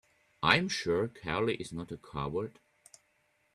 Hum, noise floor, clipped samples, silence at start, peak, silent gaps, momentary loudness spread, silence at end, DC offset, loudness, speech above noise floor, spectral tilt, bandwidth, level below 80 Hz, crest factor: none; -73 dBFS; under 0.1%; 0.4 s; -6 dBFS; none; 14 LU; 1.05 s; under 0.1%; -32 LUFS; 40 dB; -4.5 dB/octave; 13.5 kHz; -60 dBFS; 28 dB